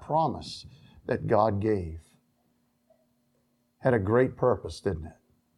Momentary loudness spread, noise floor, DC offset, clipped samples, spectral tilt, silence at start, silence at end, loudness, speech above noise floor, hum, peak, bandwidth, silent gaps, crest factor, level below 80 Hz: 18 LU; -71 dBFS; under 0.1%; under 0.1%; -7.5 dB/octave; 0 s; 0.45 s; -28 LUFS; 44 dB; none; -8 dBFS; 11.5 kHz; none; 20 dB; -52 dBFS